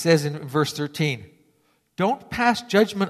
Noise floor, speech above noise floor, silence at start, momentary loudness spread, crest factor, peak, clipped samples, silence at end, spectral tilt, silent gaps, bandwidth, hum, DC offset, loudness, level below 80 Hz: -65 dBFS; 43 dB; 0 s; 6 LU; 18 dB; -6 dBFS; under 0.1%; 0 s; -5.5 dB/octave; none; 14 kHz; none; under 0.1%; -23 LUFS; -58 dBFS